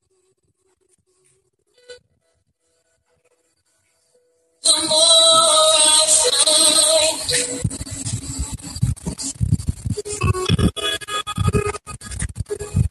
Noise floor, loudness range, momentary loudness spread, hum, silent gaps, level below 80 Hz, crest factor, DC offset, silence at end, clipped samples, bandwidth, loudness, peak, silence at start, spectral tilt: -67 dBFS; 11 LU; 17 LU; none; none; -36 dBFS; 20 dB; under 0.1%; 0 s; under 0.1%; 13 kHz; -15 LUFS; 0 dBFS; 1.9 s; -2.5 dB/octave